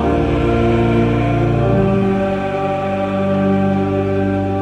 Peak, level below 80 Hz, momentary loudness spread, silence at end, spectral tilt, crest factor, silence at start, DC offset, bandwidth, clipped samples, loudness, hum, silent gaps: -4 dBFS; -30 dBFS; 4 LU; 0 s; -9 dB/octave; 12 dB; 0 s; under 0.1%; 8.6 kHz; under 0.1%; -16 LUFS; none; none